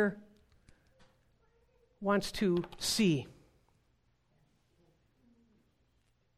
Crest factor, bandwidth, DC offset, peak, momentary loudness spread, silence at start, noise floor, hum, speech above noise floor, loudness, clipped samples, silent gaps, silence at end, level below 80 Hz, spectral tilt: 20 dB; 15.5 kHz; under 0.1%; -18 dBFS; 14 LU; 0 s; -74 dBFS; none; 43 dB; -32 LUFS; under 0.1%; none; 3.05 s; -62 dBFS; -4.5 dB/octave